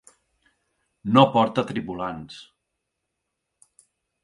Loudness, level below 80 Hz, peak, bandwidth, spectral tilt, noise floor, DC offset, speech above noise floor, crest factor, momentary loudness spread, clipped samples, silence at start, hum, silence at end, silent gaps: -22 LUFS; -62 dBFS; -2 dBFS; 11.5 kHz; -7 dB/octave; -80 dBFS; under 0.1%; 59 dB; 24 dB; 22 LU; under 0.1%; 1.05 s; none; 1.8 s; none